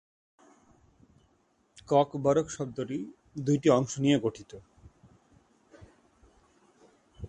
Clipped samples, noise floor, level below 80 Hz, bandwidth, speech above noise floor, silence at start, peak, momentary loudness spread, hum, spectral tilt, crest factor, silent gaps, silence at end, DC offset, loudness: under 0.1%; -69 dBFS; -60 dBFS; 9.6 kHz; 42 dB; 1.9 s; -10 dBFS; 18 LU; none; -6 dB/octave; 22 dB; none; 0 s; under 0.1%; -28 LUFS